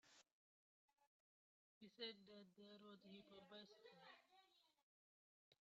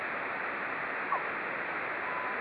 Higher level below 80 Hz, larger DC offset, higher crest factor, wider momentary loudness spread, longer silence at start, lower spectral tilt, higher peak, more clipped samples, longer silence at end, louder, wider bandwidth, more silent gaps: second, under -90 dBFS vs -74 dBFS; neither; first, 24 dB vs 16 dB; first, 12 LU vs 2 LU; about the same, 0.05 s vs 0 s; second, -2 dB/octave vs -6 dB/octave; second, -42 dBFS vs -18 dBFS; neither; about the same, 0.05 s vs 0 s; second, -62 LUFS vs -34 LUFS; second, 7.4 kHz vs 11 kHz; first, 0.32-0.88 s, 1.07-1.81 s, 4.83-5.51 s vs none